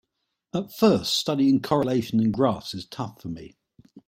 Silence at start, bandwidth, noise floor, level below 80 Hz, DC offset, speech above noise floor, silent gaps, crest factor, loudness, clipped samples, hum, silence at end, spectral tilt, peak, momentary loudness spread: 0.55 s; 16.5 kHz; -79 dBFS; -58 dBFS; under 0.1%; 55 dB; none; 18 dB; -24 LUFS; under 0.1%; none; 0.1 s; -5.5 dB/octave; -6 dBFS; 14 LU